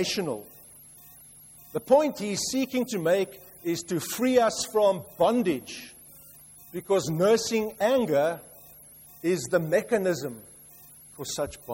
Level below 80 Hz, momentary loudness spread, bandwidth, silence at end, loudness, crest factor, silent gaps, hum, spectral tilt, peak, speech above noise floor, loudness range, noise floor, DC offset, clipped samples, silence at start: -62 dBFS; 24 LU; 16.5 kHz; 0 s; -26 LUFS; 20 dB; none; none; -4.5 dB/octave; -8 dBFS; 25 dB; 3 LU; -51 dBFS; under 0.1%; under 0.1%; 0 s